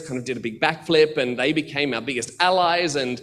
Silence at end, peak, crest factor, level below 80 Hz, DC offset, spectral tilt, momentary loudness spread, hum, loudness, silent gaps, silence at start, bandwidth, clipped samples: 0 s; -2 dBFS; 20 dB; -60 dBFS; under 0.1%; -4 dB/octave; 9 LU; none; -21 LUFS; none; 0 s; 12.5 kHz; under 0.1%